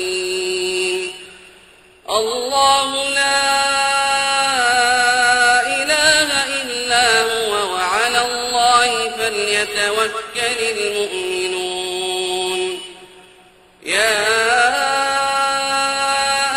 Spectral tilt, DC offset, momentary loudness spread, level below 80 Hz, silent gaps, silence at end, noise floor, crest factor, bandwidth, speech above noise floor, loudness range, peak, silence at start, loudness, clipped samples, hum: -0.5 dB/octave; under 0.1%; 8 LU; -52 dBFS; none; 0 s; -48 dBFS; 18 dB; 16 kHz; 32 dB; 6 LU; 0 dBFS; 0 s; -16 LUFS; under 0.1%; none